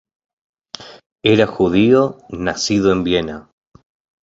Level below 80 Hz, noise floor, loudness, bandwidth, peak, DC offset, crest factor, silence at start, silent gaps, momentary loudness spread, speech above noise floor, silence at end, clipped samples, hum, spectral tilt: -44 dBFS; -37 dBFS; -16 LUFS; 8 kHz; -2 dBFS; under 0.1%; 16 dB; 0.8 s; 1.06-1.16 s; 21 LU; 22 dB; 0.8 s; under 0.1%; none; -5.5 dB/octave